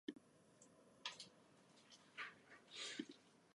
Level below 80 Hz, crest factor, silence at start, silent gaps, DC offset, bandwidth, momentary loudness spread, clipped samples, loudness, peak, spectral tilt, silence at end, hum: under -90 dBFS; 26 dB; 0.1 s; none; under 0.1%; 11.5 kHz; 19 LU; under 0.1%; -54 LUFS; -32 dBFS; -2 dB/octave; 0.05 s; none